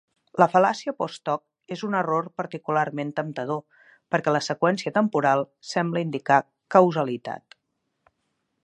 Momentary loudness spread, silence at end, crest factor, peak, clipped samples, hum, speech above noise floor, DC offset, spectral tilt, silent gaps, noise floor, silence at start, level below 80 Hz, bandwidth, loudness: 13 LU; 1.25 s; 22 dB; -2 dBFS; under 0.1%; none; 54 dB; under 0.1%; -6 dB/octave; none; -77 dBFS; 0.35 s; -76 dBFS; 10.5 kHz; -24 LUFS